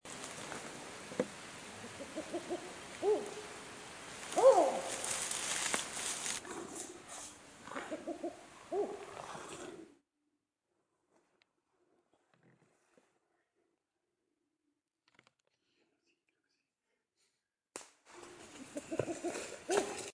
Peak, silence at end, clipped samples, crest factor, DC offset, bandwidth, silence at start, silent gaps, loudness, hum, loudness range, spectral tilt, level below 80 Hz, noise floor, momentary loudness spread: -14 dBFS; 0.05 s; under 0.1%; 26 dB; under 0.1%; 10.5 kHz; 0.05 s; none; -38 LUFS; none; 19 LU; -2.5 dB/octave; -76 dBFS; -87 dBFS; 17 LU